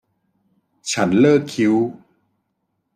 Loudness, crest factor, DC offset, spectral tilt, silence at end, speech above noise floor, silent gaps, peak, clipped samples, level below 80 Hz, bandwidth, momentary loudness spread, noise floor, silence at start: -17 LUFS; 18 dB; under 0.1%; -5.5 dB/octave; 1.05 s; 56 dB; none; -2 dBFS; under 0.1%; -64 dBFS; 15 kHz; 11 LU; -73 dBFS; 0.85 s